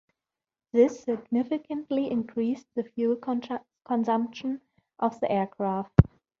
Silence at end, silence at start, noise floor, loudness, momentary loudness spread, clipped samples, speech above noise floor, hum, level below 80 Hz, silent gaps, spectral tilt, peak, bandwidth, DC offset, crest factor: 0.35 s; 0.75 s; under -90 dBFS; -28 LUFS; 11 LU; under 0.1%; over 64 dB; none; -44 dBFS; none; -8.5 dB/octave; -2 dBFS; 7.2 kHz; under 0.1%; 26 dB